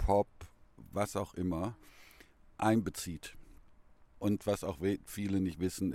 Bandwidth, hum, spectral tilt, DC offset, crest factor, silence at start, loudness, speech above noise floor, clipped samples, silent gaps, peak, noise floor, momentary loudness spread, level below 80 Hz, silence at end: 16.5 kHz; none; -6 dB/octave; under 0.1%; 20 dB; 0 s; -35 LUFS; 25 dB; under 0.1%; none; -16 dBFS; -60 dBFS; 14 LU; -50 dBFS; 0 s